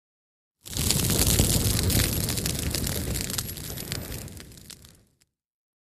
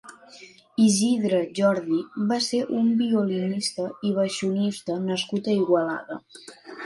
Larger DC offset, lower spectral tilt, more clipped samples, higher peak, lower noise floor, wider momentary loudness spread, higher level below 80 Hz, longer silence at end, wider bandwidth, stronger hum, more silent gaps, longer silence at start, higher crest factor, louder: neither; second, -3.5 dB/octave vs -5 dB/octave; neither; first, -4 dBFS vs -8 dBFS; first, -68 dBFS vs -49 dBFS; first, 21 LU vs 12 LU; first, -36 dBFS vs -72 dBFS; first, 0.95 s vs 0 s; first, 15.5 kHz vs 11.5 kHz; neither; neither; first, 0.65 s vs 0.05 s; first, 24 dB vs 16 dB; about the same, -25 LUFS vs -24 LUFS